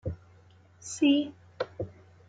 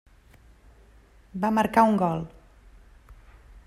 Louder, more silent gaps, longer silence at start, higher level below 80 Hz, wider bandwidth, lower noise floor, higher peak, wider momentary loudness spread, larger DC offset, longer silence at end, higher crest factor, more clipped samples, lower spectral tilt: second, -30 LUFS vs -23 LUFS; neither; second, 0.05 s vs 1.35 s; second, -58 dBFS vs -52 dBFS; second, 9.4 kHz vs 14.5 kHz; about the same, -57 dBFS vs -55 dBFS; second, -14 dBFS vs -6 dBFS; about the same, 19 LU vs 19 LU; neither; second, 0.35 s vs 0.55 s; about the same, 18 dB vs 22 dB; neither; second, -4.5 dB/octave vs -7 dB/octave